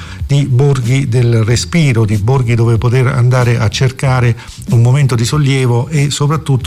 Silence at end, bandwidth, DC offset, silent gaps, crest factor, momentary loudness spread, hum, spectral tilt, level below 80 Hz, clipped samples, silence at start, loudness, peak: 0 s; 12.5 kHz; under 0.1%; none; 8 dB; 3 LU; none; -6 dB/octave; -32 dBFS; under 0.1%; 0 s; -12 LUFS; -2 dBFS